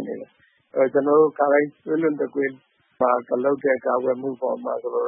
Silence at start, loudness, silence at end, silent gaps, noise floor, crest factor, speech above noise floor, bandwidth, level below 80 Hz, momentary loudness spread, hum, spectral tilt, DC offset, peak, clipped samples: 0 s; -22 LUFS; 0 s; none; -59 dBFS; 16 dB; 38 dB; 3.5 kHz; -78 dBFS; 9 LU; none; -11.5 dB/octave; under 0.1%; -6 dBFS; under 0.1%